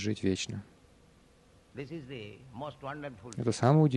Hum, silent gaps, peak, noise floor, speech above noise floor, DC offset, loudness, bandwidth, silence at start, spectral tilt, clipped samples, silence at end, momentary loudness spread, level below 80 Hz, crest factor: none; none; -10 dBFS; -61 dBFS; 30 dB; under 0.1%; -34 LUFS; 10.5 kHz; 0 s; -6.5 dB/octave; under 0.1%; 0 s; 18 LU; -64 dBFS; 22 dB